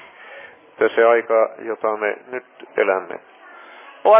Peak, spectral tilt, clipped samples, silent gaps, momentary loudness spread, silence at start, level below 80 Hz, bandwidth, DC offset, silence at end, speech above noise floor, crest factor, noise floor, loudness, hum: -2 dBFS; -7.5 dB/octave; under 0.1%; none; 24 LU; 0.25 s; -78 dBFS; 4 kHz; under 0.1%; 0 s; 23 dB; 18 dB; -42 dBFS; -20 LUFS; none